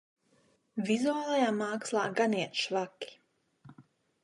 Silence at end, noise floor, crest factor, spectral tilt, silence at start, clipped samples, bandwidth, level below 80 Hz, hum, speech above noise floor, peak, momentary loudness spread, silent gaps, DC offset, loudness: 0.45 s; -69 dBFS; 18 dB; -4 dB/octave; 0.75 s; under 0.1%; 11.5 kHz; -84 dBFS; none; 39 dB; -16 dBFS; 12 LU; none; under 0.1%; -31 LUFS